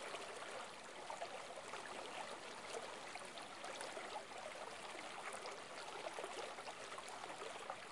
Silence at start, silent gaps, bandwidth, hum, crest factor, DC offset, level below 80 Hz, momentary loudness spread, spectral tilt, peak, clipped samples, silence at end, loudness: 0 s; none; 11.5 kHz; none; 20 dB; under 0.1%; -86 dBFS; 2 LU; -1.5 dB/octave; -32 dBFS; under 0.1%; 0 s; -50 LUFS